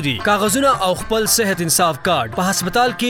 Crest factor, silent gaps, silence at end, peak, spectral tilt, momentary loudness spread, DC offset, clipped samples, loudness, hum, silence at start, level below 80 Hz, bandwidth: 14 dB; none; 0 s; -2 dBFS; -3 dB/octave; 4 LU; under 0.1%; under 0.1%; -16 LUFS; none; 0 s; -42 dBFS; 18 kHz